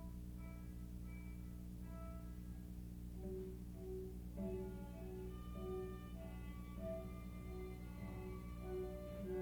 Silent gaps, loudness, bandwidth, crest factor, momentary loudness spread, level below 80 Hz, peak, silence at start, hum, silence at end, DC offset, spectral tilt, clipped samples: none; -51 LUFS; over 20 kHz; 14 dB; 5 LU; -54 dBFS; -34 dBFS; 0 s; 60 Hz at -50 dBFS; 0 s; under 0.1%; -8 dB/octave; under 0.1%